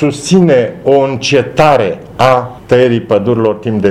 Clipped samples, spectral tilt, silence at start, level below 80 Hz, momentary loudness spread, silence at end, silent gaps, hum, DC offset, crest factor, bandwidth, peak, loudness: 0.4%; -6 dB/octave; 0 s; -42 dBFS; 5 LU; 0 s; none; none; under 0.1%; 10 dB; 13.5 kHz; 0 dBFS; -11 LUFS